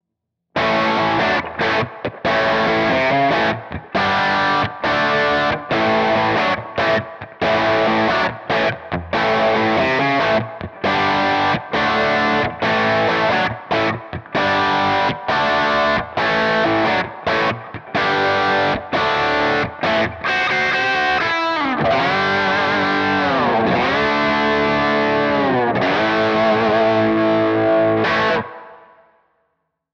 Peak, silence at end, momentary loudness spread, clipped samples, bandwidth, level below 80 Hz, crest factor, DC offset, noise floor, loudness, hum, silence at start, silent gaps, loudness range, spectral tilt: -6 dBFS; 1.2 s; 4 LU; under 0.1%; 8 kHz; -46 dBFS; 10 dB; under 0.1%; -79 dBFS; -17 LUFS; none; 0.55 s; none; 2 LU; -5.5 dB/octave